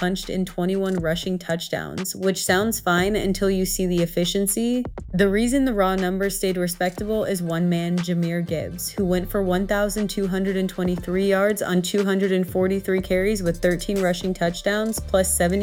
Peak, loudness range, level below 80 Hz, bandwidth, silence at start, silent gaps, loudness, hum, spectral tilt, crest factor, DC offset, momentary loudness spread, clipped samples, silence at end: -4 dBFS; 2 LU; -38 dBFS; 17.5 kHz; 0 s; none; -22 LUFS; none; -5 dB/octave; 18 dB; under 0.1%; 6 LU; under 0.1%; 0 s